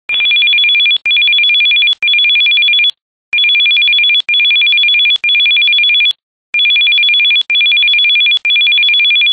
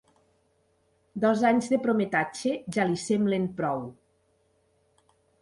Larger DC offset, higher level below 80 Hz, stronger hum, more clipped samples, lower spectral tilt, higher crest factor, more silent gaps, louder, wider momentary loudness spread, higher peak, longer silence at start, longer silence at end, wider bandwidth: neither; first, -62 dBFS vs -68 dBFS; neither; neither; second, 2 dB/octave vs -6 dB/octave; second, 6 dB vs 20 dB; first, 3.02-3.32 s, 6.23-6.53 s vs none; first, -7 LUFS vs -26 LUFS; second, 3 LU vs 7 LU; first, -4 dBFS vs -10 dBFS; second, 0.1 s vs 1.15 s; second, 0 s vs 1.5 s; second, 7.8 kHz vs 11.5 kHz